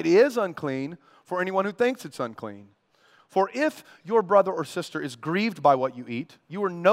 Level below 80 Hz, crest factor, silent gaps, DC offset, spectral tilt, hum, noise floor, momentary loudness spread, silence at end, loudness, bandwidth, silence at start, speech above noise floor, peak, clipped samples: -78 dBFS; 20 dB; none; under 0.1%; -6 dB/octave; none; -61 dBFS; 14 LU; 0 s; -26 LUFS; 16 kHz; 0 s; 36 dB; -6 dBFS; under 0.1%